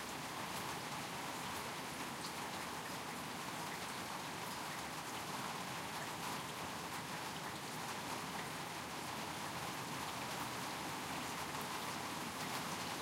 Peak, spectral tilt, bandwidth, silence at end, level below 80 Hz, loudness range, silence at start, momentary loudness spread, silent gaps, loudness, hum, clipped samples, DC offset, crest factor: -28 dBFS; -2.5 dB/octave; 16 kHz; 0 s; -72 dBFS; 1 LU; 0 s; 2 LU; none; -43 LUFS; none; under 0.1%; under 0.1%; 16 dB